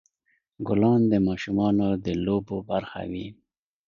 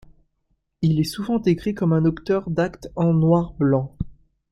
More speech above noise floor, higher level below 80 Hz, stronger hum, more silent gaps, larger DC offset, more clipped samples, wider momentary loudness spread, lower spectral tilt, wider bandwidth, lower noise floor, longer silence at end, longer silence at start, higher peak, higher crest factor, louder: about the same, 48 dB vs 50 dB; second, -50 dBFS vs -44 dBFS; neither; neither; neither; neither; first, 14 LU vs 7 LU; about the same, -8.5 dB/octave vs -8 dB/octave; second, 7.2 kHz vs 13 kHz; about the same, -72 dBFS vs -70 dBFS; first, 0.55 s vs 0.4 s; second, 0.6 s vs 0.8 s; about the same, -8 dBFS vs -6 dBFS; about the same, 16 dB vs 16 dB; second, -25 LUFS vs -21 LUFS